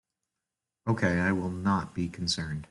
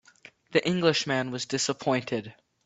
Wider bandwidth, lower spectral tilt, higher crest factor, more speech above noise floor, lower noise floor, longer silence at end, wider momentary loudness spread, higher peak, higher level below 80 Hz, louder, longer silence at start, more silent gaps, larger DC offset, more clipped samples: first, 11.5 kHz vs 8.4 kHz; first, -5.5 dB/octave vs -4 dB/octave; about the same, 18 dB vs 20 dB; first, 59 dB vs 28 dB; first, -88 dBFS vs -55 dBFS; second, 0.05 s vs 0.35 s; second, 7 LU vs 10 LU; second, -14 dBFS vs -8 dBFS; first, -58 dBFS vs -68 dBFS; about the same, -29 LUFS vs -27 LUFS; first, 0.85 s vs 0.5 s; neither; neither; neither